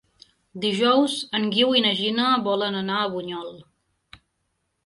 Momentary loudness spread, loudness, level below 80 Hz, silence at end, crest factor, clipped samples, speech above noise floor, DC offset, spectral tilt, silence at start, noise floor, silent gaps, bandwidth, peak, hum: 14 LU; -22 LUFS; -68 dBFS; 1.25 s; 18 dB; under 0.1%; 52 dB; under 0.1%; -4.5 dB/octave; 0.55 s; -74 dBFS; none; 11.5 kHz; -6 dBFS; none